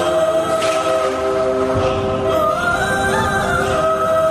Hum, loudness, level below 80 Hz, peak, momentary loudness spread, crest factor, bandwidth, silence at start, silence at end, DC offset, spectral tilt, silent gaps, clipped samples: none; -17 LUFS; -38 dBFS; -6 dBFS; 2 LU; 10 dB; 14.5 kHz; 0 s; 0 s; under 0.1%; -4.5 dB/octave; none; under 0.1%